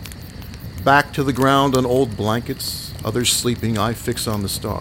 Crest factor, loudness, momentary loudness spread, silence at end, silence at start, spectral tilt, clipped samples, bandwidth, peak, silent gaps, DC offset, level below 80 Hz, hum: 20 dB; -19 LUFS; 15 LU; 0 s; 0 s; -4 dB/octave; under 0.1%; 17 kHz; 0 dBFS; none; under 0.1%; -40 dBFS; none